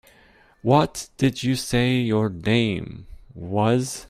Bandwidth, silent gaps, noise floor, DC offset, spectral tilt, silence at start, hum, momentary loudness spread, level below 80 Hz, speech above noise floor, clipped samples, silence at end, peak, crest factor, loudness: 15.5 kHz; none; -55 dBFS; under 0.1%; -5.5 dB/octave; 0.65 s; none; 11 LU; -48 dBFS; 33 dB; under 0.1%; 0.05 s; -4 dBFS; 18 dB; -22 LUFS